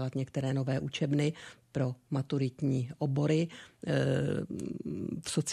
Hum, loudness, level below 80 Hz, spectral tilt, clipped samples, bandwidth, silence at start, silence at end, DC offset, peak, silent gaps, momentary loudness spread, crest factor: none; -33 LUFS; -64 dBFS; -6 dB/octave; under 0.1%; 12.5 kHz; 0 s; 0 s; under 0.1%; -16 dBFS; none; 9 LU; 16 dB